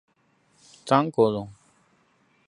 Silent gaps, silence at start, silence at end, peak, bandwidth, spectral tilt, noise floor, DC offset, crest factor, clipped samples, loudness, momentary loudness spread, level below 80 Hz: none; 0.85 s; 0.95 s; -4 dBFS; 11 kHz; -6.5 dB/octave; -66 dBFS; under 0.1%; 24 dB; under 0.1%; -23 LUFS; 22 LU; -66 dBFS